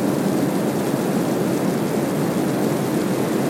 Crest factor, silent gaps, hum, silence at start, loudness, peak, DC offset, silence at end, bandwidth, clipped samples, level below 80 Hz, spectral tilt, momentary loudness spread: 14 dB; none; none; 0 s; -21 LUFS; -6 dBFS; under 0.1%; 0 s; 16.5 kHz; under 0.1%; -58 dBFS; -6 dB/octave; 1 LU